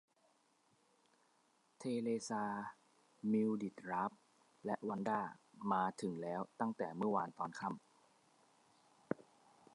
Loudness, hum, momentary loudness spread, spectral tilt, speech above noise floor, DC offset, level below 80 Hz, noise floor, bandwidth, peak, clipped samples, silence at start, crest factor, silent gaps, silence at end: -42 LUFS; none; 9 LU; -6.5 dB/octave; 36 dB; under 0.1%; -86 dBFS; -76 dBFS; 11.5 kHz; -20 dBFS; under 0.1%; 1.8 s; 22 dB; none; 0.55 s